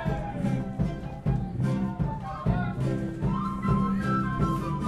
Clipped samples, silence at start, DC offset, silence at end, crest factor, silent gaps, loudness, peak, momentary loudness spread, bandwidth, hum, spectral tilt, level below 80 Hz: under 0.1%; 0 s; under 0.1%; 0 s; 16 dB; none; -29 LUFS; -12 dBFS; 5 LU; 11.5 kHz; none; -8.5 dB/octave; -38 dBFS